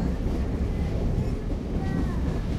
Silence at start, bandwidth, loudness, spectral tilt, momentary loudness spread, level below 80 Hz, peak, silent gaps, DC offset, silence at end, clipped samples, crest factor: 0 s; 12 kHz; -29 LUFS; -8.5 dB/octave; 2 LU; -30 dBFS; -14 dBFS; none; under 0.1%; 0 s; under 0.1%; 12 dB